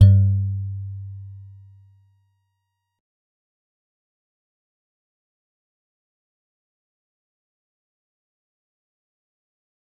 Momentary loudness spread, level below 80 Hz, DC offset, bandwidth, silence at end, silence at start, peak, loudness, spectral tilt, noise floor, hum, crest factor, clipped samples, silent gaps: 24 LU; -52 dBFS; under 0.1%; 4.7 kHz; 8.55 s; 0 s; -2 dBFS; -21 LUFS; -10 dB/octave; -77 dBFS; none; 24 dB; under 0.1%; none